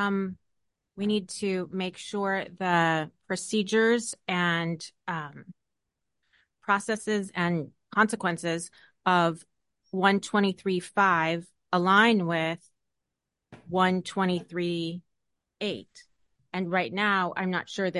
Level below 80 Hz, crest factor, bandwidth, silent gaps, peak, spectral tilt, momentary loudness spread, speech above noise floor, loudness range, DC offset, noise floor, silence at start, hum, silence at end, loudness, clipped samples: -72 dBFS; 22 dB; 11.5 kHz; none; -6 dBFS; -5 dB/octave; 11 LU; 58 dB; 6 LU; under 0.1%; -85 dBFS; 0 s; none; 0 s; -27 LUFS; under 0.1%